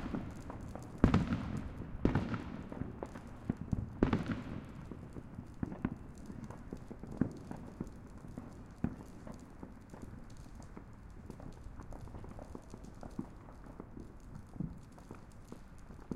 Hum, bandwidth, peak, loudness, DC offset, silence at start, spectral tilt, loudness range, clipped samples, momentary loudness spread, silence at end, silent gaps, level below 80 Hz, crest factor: none; 13 kHz; -10 dBFS; -42 LUFS; under 0.1%; 0 s; -8 dB/octave; 13 LU; under 0.1%; 19 LU; 0 s; none; -50 dBFS; 32 dB